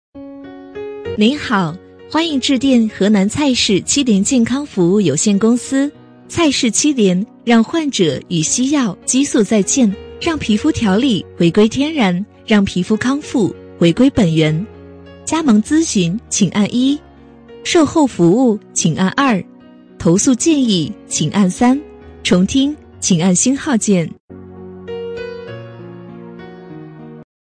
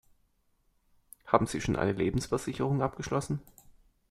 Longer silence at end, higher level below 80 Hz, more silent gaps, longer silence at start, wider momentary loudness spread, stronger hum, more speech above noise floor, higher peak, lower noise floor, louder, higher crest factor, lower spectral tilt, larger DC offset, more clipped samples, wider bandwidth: second, 0.25 s vs 0.7 s; first, -46 dBFS vs -52 dBFS; first, 24.20-24.28 s vs none; second, 0.15 s vs 1.25 s; first, 17 LU vs 6 LU; neither; second, 27 dB vs 41 dB; first, -2 dBFS vs -6 dBFS; second, -41 dBFS vs -71 dBFS; first, -15 LUFS vs -31 LUFS; second, 14 dB vs 26 dB; second, -4.5 dB/octave vs -6 dB/octave; neither; neither; second, 10.5 kHz vs 15 kHz